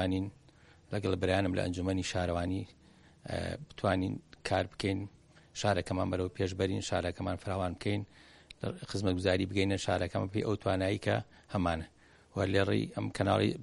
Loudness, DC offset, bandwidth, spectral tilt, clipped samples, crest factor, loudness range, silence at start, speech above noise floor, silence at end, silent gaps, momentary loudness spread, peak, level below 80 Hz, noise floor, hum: -34 LUFS; under 0.1%; 11.5 kHz; -6 dB/octave; under 0.1%; 20 dB; 3 LU; 0 s; 28 dB; 0 s; none; 10 LU; -12 dBFS; -56 dBFS; -60 dBFS; none